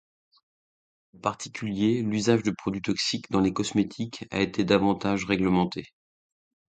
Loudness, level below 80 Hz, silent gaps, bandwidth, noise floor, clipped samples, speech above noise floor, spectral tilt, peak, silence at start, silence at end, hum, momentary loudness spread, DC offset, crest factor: -26 LUFS; -56 dBFS; none; 9.4 kHz; under -90 dBFS; under 0.1%; over 64 dB; -5.5 dB/octave; -8 dBFS; 1.25 s; 0.9 s; none; 9 LU; under 0.1%; 20 dB